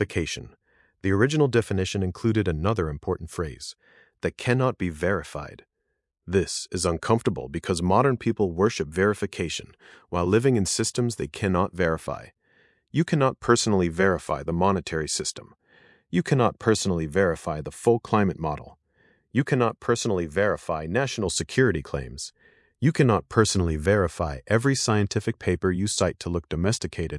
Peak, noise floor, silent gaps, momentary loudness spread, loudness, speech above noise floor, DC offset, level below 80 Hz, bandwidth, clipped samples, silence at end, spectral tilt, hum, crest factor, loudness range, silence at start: -4 dBFS; -79 dBFS; none; 10 LU; -25 LUFS; 54 dB; under 0.1%; -48 dBFS; 12 kHz; under 0.1%; 0 s; -5 dB/octave; none; 22 dB; 3 LU; 0 s